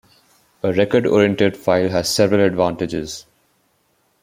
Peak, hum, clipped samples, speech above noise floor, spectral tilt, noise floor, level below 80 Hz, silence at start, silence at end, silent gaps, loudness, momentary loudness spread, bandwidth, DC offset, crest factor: -2 dBFS; none; under 0.1%; 46 dB; -5 dB/octave; -63 dBFS; -52 dBFS; 0.65 s; 1 s; none; -17 LUFS; 10 LU; 16 kHz; under 0.1%; 18 dB